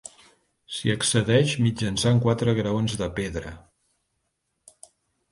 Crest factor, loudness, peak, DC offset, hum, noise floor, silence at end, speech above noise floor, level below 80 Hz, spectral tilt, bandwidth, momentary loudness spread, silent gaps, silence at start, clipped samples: 20 dB; -24 LUFS; -6 dBFS; under 0.1%; none; -76 dBFS; 1.75 s; 53 dB; -48 dBFS; -5 dB/octave; 11.5 kHz; 15 LU; none; 0.7 s; under 0.1%